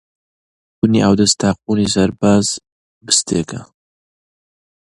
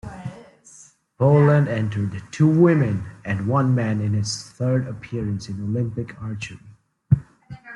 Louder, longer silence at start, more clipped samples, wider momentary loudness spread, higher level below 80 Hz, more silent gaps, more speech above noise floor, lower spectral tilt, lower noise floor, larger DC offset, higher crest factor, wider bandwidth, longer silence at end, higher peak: first, -15 LUFS vs -21 LUFS; first, 0.85 s vs 0.05 s; neither; second, 10 LU vs 15 LU; first, -44 dBFS vs -52 dBFS; first, 2.72-3.01 s vs none; first, over 75 dB vs 30 dB; second, -4 dB/octave vs -7.5 dB/octave; first, under -90 dBFS vs -50 dBFS; neither; about the same, 18 dB vs 18 dB; about the same, 11.5 kHz vs 11 kHz; first, 1.2 s vs 0 s; first, 0 dBFS vs -4 dBFS